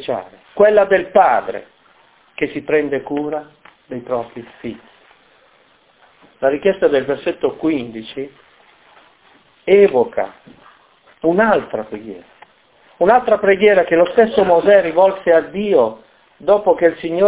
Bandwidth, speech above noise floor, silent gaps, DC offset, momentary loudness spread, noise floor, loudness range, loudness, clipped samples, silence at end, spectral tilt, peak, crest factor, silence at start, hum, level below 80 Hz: 4 kHz; 38 dB; none; under 0.1%; 19 LU; -53 dBFS; 10 LU; -15 LUFS; under 0.1%; 0 s; -9.5 dB/octave; 0 dBFS; 16 dB; 0 s; none; -54 dBFS